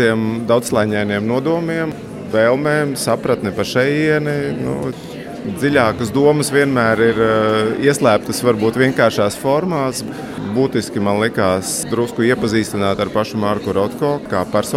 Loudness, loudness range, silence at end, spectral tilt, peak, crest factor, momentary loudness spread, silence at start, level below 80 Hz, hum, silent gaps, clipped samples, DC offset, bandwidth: -17 LUFS; 3 LU; 0 s; -5 dB/octave; -2 dBFS; 16 dB; 7 LU; 0 s; -48 dBFS; none; none; under 0.1%; under 0.1%; 16 kHz